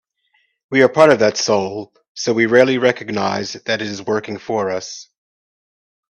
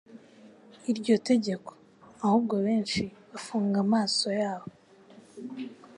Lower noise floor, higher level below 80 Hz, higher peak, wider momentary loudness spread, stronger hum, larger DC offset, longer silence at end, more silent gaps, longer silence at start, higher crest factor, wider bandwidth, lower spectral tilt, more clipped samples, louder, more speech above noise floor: first, -64 dBFS vs -54 dBFS; about the same, -62 dBFS vs -66 dBFS; first, 0 dBFS vs -12 dBFS; second, 14 LU vs 17 LU; neither; neither; first, 1.1 s vs 0 s; first, 2.08-2.15 s vs none; first, 0.7 s vs 0.1 s; about the same, 18 dB vs 18 dB; second, 8.8 kHz vs 11 kHz; about the same, -4 dB/octave vs -5 dB/octave; neither; first, -17 LUFS vs -28 LUFS; first, 47 dB vs 27 dB